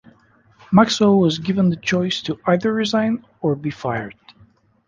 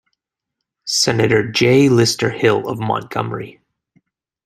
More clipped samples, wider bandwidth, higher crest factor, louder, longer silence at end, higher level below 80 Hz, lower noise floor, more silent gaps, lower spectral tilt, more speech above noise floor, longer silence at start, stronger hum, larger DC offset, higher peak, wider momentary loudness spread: neither; second, 7.6 kHz vs 15.5 kHz; about the same, 18 dB vs 16 dB; second, -19 LUFS vs -16 LUFS; second, 0.75 s vs 0.95 s; about the same, -54 dBFS vs -54 dBFS; second, -54 dBFS vs -80 dBFS; neither; first, -6 dB/octave vs -4.5 dB/octave; second, 36 dB vs 65 dB; second, 0.7 s vs 0.85 s; neither; neither; about the same, -2 dBFS vs -2 dBFS; second, 10 LU vs 14 LU